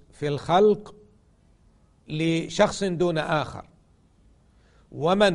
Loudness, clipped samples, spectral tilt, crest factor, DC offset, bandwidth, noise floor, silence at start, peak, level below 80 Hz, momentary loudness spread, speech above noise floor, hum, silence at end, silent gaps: -24 LUFS; under 0.1%; -5.5 dB/octave; 20 dB; under 0.1%; 11 kHz; -59 dBFS; 0.2 s; -6 dBFS; -52 dBFS; 15 LU; 36 dB; none; 0 s; none